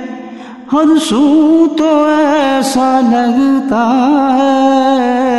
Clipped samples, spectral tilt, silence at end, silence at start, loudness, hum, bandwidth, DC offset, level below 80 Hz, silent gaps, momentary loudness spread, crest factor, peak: under 0.1%; -4.5 dB/octave; 0 s; 0 s; -10 LUFS; none; 12.5 kHz; 0.4%; -52 dBFS; none; 4 LU; 10 dB; 0 dBFS